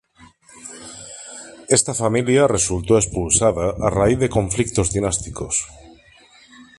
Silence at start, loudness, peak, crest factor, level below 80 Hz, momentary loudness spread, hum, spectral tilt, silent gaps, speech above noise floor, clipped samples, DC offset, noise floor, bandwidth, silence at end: 0.2 s; -18 LUFS; -2 dBFS; 18 dB; -38 dBFS; 19 LU; none; -4.5 dB/octave; none; 31 dB; under 0.1%; under 0.1%; -50 dBFS; 11.5 kHz; 0.15 s